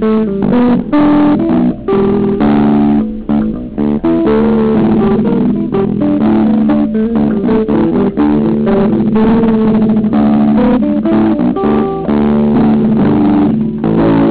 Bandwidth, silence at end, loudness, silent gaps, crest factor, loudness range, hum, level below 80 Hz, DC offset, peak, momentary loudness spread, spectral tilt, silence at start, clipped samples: 4 kHz; 0 s; -11 LUFS; none; 6 dB; 1 LU; none; -32 dBFS; under 0.1%; -4 dBFS; 4 LU; -12.5 dB/octave; 0 s; under 0.1%